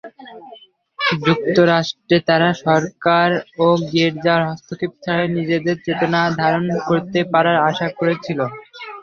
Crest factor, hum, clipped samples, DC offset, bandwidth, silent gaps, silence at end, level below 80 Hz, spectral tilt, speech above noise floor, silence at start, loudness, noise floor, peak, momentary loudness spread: 16 dB; none; under 0.1%; under 0.1%; 7 kHz; none; 0 s; -58 dBFS; -6.5 dB/octave; 27 dB; 0.05 s; -18 LUFS; -44 dBFS; -2 dBFS; 10 LU